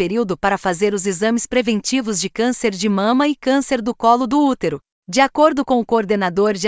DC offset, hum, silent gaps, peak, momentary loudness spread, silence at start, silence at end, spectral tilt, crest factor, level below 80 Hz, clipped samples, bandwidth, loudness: under 0.1%; none; 4.92-5.03 s; -2 dBFS; 5 LU; 0 s; 0 s; -4.5 dB/octave; 16 dB; -52 dBFS; under 0.1%; 8 kHz; -18 LUFS